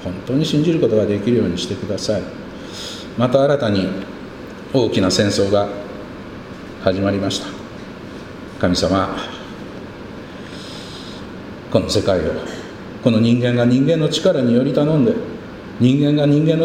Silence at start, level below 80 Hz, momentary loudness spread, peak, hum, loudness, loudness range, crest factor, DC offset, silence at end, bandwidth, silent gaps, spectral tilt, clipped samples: 0 s; -44 dBFS; 18 LU; 0 dBFS; none; -17 LUFS; 7 LU; 18 dB; under 0.1%; 0 s; 14.5 kHz; none; -6 dB/octave; under 0.1%